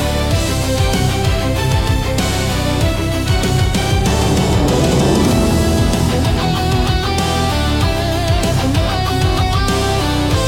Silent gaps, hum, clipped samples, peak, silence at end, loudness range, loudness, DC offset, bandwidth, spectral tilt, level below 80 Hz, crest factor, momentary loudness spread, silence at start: none; none; under 0.1%; -4 dBFS; 0 s; 2 LU; -15 LUFS; under 0.1%; 17 kHz; -5 dB/octave; -22 dBFS; 12 dB; 3 LU; 0 s